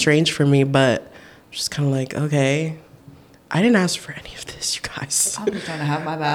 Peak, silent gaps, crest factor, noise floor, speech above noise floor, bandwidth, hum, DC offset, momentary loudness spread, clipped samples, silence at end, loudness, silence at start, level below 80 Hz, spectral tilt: -4 dBFS; none; 18 dB; -46 dBFS; 27 dB; 17 kHz; none; under 0.1%; 12 LU; under 0.1%; 0 s; -20 LUFS; 0 s; -54 dBFS; -4.5 dB/octave